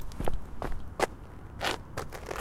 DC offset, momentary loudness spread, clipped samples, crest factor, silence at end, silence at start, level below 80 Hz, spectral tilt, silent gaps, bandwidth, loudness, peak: under 0.1%; 7 LU; under 0.1%; 22 dB; 0 s; 0 s; -40 dBFS; -4 dB/octave; none; 15.5 kHz; -36 LUFS; -10 dBFS